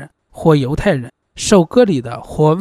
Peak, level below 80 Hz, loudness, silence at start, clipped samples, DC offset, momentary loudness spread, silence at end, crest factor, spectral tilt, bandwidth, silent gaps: 0 dBFS; -36 dBFS; -15 LUFS; 0 s; under 0.1%; under 0.1%; 11 LU; 0 s; 14 dB; -6 dB/octave; 13.5 kHz; none